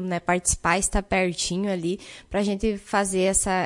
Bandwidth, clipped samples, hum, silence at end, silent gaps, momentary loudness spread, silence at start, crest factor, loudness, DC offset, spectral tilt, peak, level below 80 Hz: 11.5 kHz; under 0.1%; none; 0 s; none; 7 LU; 0 s; 18 dB; -24 LUFS; under 0.1%; -3.5 dB/octave; -6 dBFS; -38 dBFS